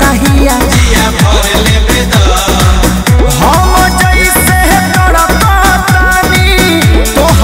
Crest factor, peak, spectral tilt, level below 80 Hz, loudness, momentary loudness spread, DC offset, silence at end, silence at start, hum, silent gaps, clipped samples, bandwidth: 6 dB; 0 dBFS; -4 dB/octave; -12 dBFS; -7 LUFS; 2 LU; under 0.1%; 0 s; 0 s; none; none; 0.2%; 16.5 kHz